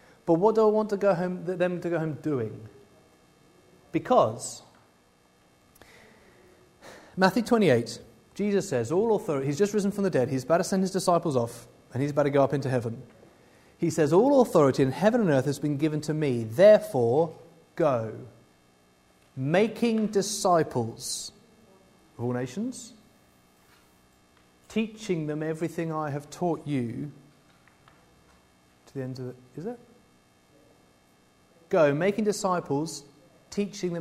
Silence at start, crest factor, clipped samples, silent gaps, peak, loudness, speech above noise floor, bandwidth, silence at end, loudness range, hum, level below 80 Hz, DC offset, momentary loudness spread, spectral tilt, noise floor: 0.25 s; 22 dB; under 0.1%; none; -4 dBFS; -26 LUFS; 37 dB; 16 kHz; 0 s; 12 LU; none; -64 dBFS; under 0.1%; 16 LU; -6 dB/octave; -62 dBFS